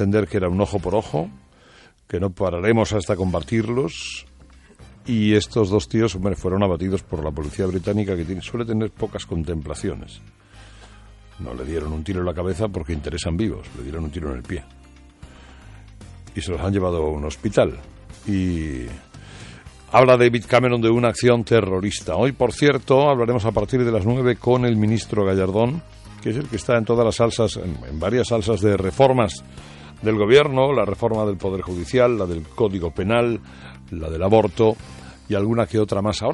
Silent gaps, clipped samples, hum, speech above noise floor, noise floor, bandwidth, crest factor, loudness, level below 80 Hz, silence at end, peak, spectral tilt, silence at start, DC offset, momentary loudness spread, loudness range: none; under 0.1%; none; 30 dB; -51 dBFS; 11.5 kHz; 18 dB; -21 LUFS; -42 dBFS; 0 s; -2 dBFS; -6.5 dB/octave; 0 s; under 0.1%; 15 LU; 10 LU